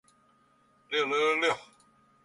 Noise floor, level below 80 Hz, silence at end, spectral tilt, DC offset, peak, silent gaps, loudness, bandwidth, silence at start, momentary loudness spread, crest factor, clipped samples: -66 dBFS; -76 dBFS; 0.6 s; -2.5 dB/octave; under 0.1%; -16 dBFS; none; -28 LUFS; 11.5 kHz; 0.9 s; 8 LU; 18 dB; under 0.1%